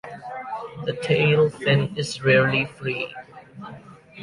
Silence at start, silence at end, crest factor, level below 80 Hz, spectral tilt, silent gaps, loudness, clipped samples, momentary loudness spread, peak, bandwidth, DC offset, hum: 0.05 s; 0 s; 18 dB; -58 dBFS; -6 dB/octave; none; -22 LUFS; under 0.1%; 22 LU; -6 dBFS; 11.5 kHz; under 0.1%; none